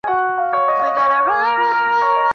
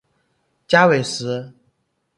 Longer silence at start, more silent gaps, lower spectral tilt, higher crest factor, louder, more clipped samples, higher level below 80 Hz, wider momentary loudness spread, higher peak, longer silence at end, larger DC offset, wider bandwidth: second, 0.05 s vs 0.7 s; neither; about the same, -4 dB/octave vs -4.5 dB/octave; second, 10 dB vs 20 dB; about the same, -16 LUFS vs -18 LUFS; neither; about the same, -58 dBFS vs -62 dBFS; second, 3 LU vs 13 LU; second, -6 dBFS vs 0 dBFS; second, 0 s vs 0.7 s; neither; second, 6.6 kHz vs 11.5 kHz